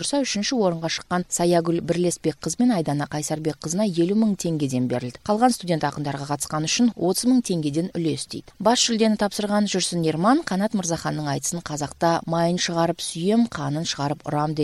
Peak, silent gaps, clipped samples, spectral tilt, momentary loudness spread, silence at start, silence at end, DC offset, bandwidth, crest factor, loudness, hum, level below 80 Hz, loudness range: -4 dBFS; none; under 0.1%; -4.5 dB/octave; 6 LU; 0 s; 0 s; under 0.1%; 14 kHz; 18 dB; -23 LUFS; none; -56 dBFS; 2 LU